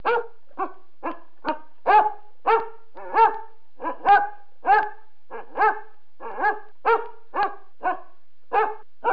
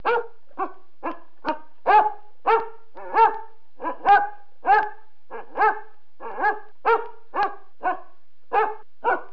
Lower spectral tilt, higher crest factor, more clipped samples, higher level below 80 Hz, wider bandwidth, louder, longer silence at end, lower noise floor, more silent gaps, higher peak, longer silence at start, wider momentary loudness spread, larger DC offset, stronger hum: about the same, -6 dB/octave vs -5.5 dB/octave; about the same, 18 dB vs 18 dB; neither; about the same, -66 dBFS vs -66 dBFS; about the same, 5.2 kHz vs 5.4 kHz; about the same, -23 LUFS vs -23 LUFS; about the same, 0 s vs 0.1 s; about the same, -57 dBFS vs -57 dBFS; neither; about the same, -6 dBFS vs -6 dBFS; about the same, 0.05 s vs 0.05 s; about the same, 17 LU vs 17 LU; about the same, 2% vs 2%; neither